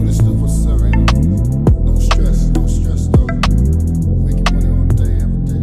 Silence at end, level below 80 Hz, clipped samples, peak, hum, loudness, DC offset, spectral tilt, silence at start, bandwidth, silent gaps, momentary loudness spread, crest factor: 0 s; -14 dBFS; under 0.1%; 0 dBFS; none; -15 LUFS; under 0.1%; -7 dB/octave; 0 s; 12 kHz; none; 3 LU; 12 dB